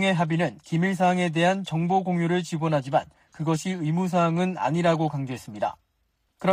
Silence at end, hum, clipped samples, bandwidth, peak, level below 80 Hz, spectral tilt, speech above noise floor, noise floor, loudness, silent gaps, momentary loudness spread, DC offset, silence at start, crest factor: 0 s; none; under 0.1%; 11 kHz; -10 dBFS; -64 dBFS; -6.5 dB/octave; 48 dB; -72 dBFS; -25 LUFS; none; 8 LU; under 0.1%; 0 s; 16 dB